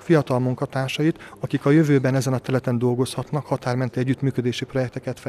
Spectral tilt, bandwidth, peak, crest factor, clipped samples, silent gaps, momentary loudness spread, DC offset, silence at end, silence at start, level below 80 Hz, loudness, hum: -7 dB/octave; 13.5 kHz; -6 dBFS; 16 dB; under 0.1%; none; 8 LU; under 0.1%; 0 s; 0 s; -58 dBFS; -22 LUFS; none